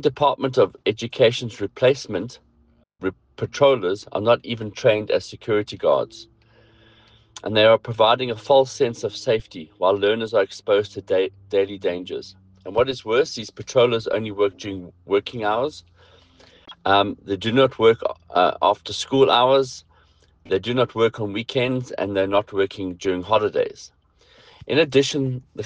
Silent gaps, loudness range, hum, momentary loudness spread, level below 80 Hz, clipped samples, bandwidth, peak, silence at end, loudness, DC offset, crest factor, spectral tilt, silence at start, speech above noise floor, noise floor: none; 4 LU; none; 12 LU; -58 dBFS; under 0.1%; 9.4 kHz; -4 dBFS; 0 s; -21 LUFS; under 0.1%; 18 dB; -5 dB/octave; 0 s; 38 dB; -59 dBFS